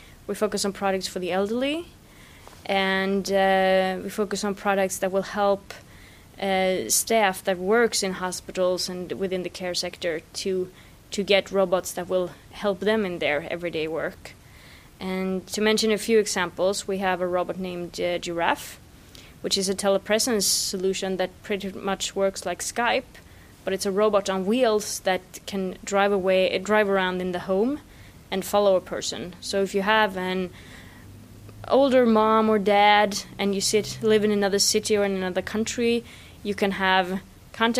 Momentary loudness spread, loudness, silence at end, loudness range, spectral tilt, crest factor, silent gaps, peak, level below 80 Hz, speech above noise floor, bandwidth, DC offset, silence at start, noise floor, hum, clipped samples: 11 LU; -24 LUFS; 0 s; 5 LU; -3.5 dB/octave; 22 dB; none; -2 dBFS; -54 dBFS; 25 dB; 15.5 kHz; under 0.1%; 0 s; -48 dBFS; none; under 0.1%